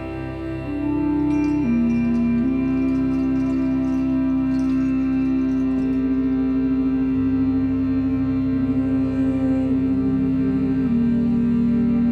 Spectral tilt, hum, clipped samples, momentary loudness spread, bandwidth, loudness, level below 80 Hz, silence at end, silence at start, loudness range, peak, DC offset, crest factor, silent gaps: -9.5 dB/octave; none; under 0.1%; 2 LU; 6 kHz; -21 LUFS; -38 dBFS; 0 s; 0 s; 1 LU; -10 dBFS; under 0.1%; 8 dB; none